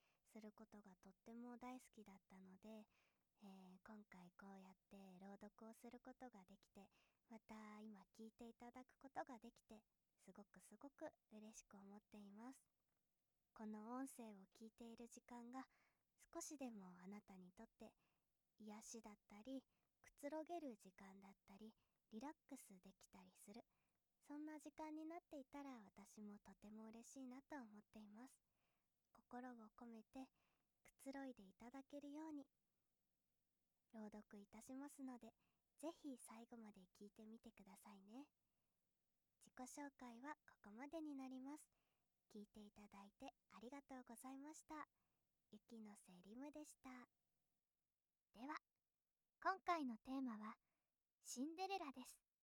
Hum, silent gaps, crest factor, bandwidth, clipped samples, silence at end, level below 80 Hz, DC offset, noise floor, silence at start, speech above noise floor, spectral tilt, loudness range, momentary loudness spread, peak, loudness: none; 51.13-51.18 s; 28 dB; 19.5 kHz; under 0.1%; 0.25 s; -90 dBFS; under 0.1%; under -90 dBFS; 0.25 s; over 32 dB; -4 dB/octave; 11 LU; 13 LU; -32 dBFS; -59 LUFS